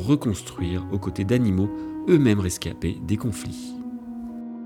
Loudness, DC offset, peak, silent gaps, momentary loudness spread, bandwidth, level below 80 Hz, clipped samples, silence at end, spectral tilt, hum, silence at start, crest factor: -25 LUFS; under 0.1%; -6 dBFS; none; 15 LU; 17 kHz; -48 dBFS; under 0.1%; 0 s; -6.5 dB/octave; none; 0 s; 18 dB